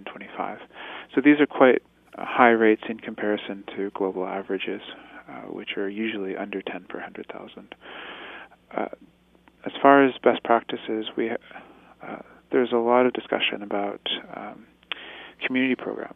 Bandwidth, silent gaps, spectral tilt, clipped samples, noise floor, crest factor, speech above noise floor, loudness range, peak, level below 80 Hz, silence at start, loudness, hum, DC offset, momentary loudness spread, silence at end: 3.9 kHz; none; -7.5 dB/octave; under 0.1%; -58 dBFS; 24 dB; 34 dB; 11 LU; -2 dBFS; -70 dBFS; 0 s; -24 LUFS; none; under 0.1%; 22 LU; 0.05 s